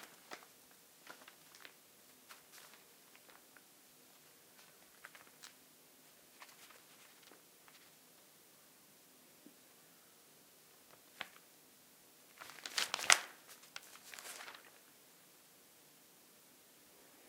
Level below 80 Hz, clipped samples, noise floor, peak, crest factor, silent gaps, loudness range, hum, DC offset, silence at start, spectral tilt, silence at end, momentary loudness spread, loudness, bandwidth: under -90 dBFS; under 0.1%; -65 dBFS; 0 dBFS; 48 dB; none; 23 LU; none; under 0.1%; 0 s; 1.5 dB/octave; 0 s; 13 LU; -38 LUFS; 16 kHz